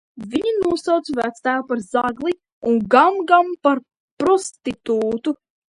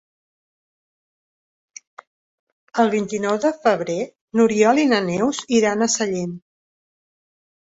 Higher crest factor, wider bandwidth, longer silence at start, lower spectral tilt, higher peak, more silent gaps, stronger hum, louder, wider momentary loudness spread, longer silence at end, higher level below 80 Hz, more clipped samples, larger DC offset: about the same, 20 dB vs 18 dB; first, 11.5 kHz vs 8 kHz; second, 0.15 s vs 2.75 s; about the same, -4.5 dB/octave vs -4 dB/octave; first, 0 dBFS vs -4 dBFS; first, 2.52-2.61 s, 4.00-4.17 s vs 4.21-4.28 s; neither; about the same, -20 LUFS vs -19 LUFS; about the same, 11 LU vs 11 LU; second, 0.4 s vs 1.4 s; first, -56 dBFS vs -64 dBFS; neither; neither